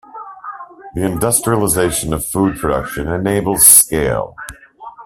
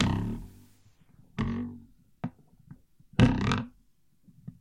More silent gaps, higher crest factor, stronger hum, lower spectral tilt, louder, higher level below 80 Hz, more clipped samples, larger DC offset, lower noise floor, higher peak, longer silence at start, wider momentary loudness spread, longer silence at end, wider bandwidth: neither; second, 16 dB vs 26 dB; neither; second, -3.5 dB/octave vs -7 dB/octave; first, -13 LUFS vs -30 LUFS; first, -36 dBFS vs -46 dBFS; first, 0.2% vs under 0.1%; neither; second, -36 dBFS vs -67 dBFS; first, 0 dBFS vs -6 dBFS; first, 0.15 s vs 0 s; about the same, 25 LU vs 26 LU; about the same, 0 s vs 0.1 s; first, 16 kHz vs 11.5 kHz